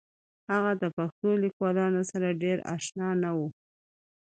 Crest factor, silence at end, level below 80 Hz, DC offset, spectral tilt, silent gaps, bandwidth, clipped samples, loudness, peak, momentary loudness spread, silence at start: 16 dB; 0.7 s; -74 dBFS; under 0.1%; -6.5 dB/octave; 0.93-0.97 s, 1.12-1.22 s, 1.53-1.60 s; 9.2 kHz; under 0.1%; -29 LUFS; -14 dBFS; 5 LU; 0.5 s